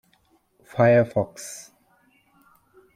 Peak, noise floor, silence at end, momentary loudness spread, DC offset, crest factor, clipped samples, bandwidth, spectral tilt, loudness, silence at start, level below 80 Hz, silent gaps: -6 dBFS; -64 dBFS; 1.35 s; 20 LU; under 0.1%; 20 dB; under 0.1%; 15 kHz; -6.5 dB/octave; -21 LUFS; 0.75 s; -64 dBFS; none